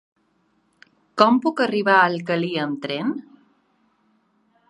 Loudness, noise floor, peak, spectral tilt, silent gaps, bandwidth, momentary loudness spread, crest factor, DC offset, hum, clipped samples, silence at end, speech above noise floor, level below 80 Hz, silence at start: -20 LUFS; -65 dBFS; 0 dBFS; -6 dB/octave; none; 10.5 kHz; 11 LU; 24 dB; under 0.1%; none; under 0.1%; 1.5 s; 46 dB; -74 dBFS; 1.15 s